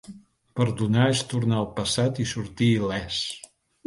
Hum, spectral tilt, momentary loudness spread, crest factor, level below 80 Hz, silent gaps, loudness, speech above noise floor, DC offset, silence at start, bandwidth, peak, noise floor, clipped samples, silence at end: none; -5.5 dB/octave; 8 LU; 16 dB; -52 dBFS; none; -25 LUFS; 23 dB; under 0.1%; 0.1 s; 11.5 kHz; -10 dBFS; -47 dBFS; under 0.1%; 0.45 s